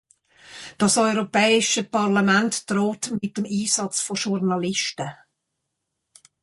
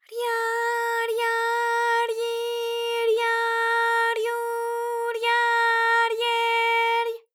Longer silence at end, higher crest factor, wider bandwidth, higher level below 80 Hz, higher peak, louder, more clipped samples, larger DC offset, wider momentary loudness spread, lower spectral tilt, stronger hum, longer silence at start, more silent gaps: first, 1.3 s vs 0.15 s; first, 18 dB vs 12 dB; second, 11.5 kHz vs 19 kHz; first, -66 dBFS vs under -90 dBFS; first, -6 dBFS vs -12 dBFS; about the same, -21 LUFS vs -23 LUFS; neither; neither; about the same, 9 LU vs 7 LU; first, -3.5 dB/octave vs 3.5 dB/octave; neither; first, 0.5 s vs 0.1 s; neither